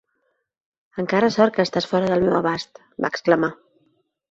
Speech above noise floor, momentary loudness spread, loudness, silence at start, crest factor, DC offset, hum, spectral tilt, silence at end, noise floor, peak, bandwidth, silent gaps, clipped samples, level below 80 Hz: 51 dB; 11 LU; -21 LUFS; 0.95 s; 20 dB; under 0.1%; none; -6 dB/octave; 0.75 s; -71 dBFS; -2 dBFS; 7.8 kHz; none; under 0.1%; -58 dBFS